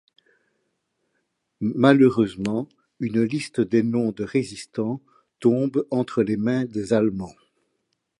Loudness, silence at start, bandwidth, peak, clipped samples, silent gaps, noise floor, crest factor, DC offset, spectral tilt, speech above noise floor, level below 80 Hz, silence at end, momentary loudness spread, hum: -23 LUFS; 1.6 s; 11.5 kHz; -2 dBFS; under 0.1%; none; -75 dBFS; 22 dB; under 0.1%; -7 dB/octave; 53 dB; -60 dBFS; 0.9 s; 12 LU; none